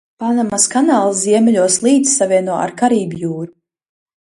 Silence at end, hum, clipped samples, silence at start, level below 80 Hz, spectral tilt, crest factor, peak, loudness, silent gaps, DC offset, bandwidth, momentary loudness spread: 0.75 s; none; under 0.1%; 0.2 s; -60 dBFS; -4 dB/octave; 14 dB; 0 dBFS; -14 LUFS; none; under 0.1%; 11.5 kHz; 10 LU